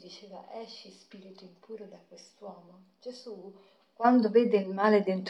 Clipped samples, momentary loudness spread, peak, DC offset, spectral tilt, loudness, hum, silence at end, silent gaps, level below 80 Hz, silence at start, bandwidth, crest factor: under 0.1%; 24 LU; -10 dBFS; under 0.1%; -7 dB/octave; -25 LUFS; none; 0 s; none; -90 dBFS; 0.05 s; 8.2 kHz; 20 dB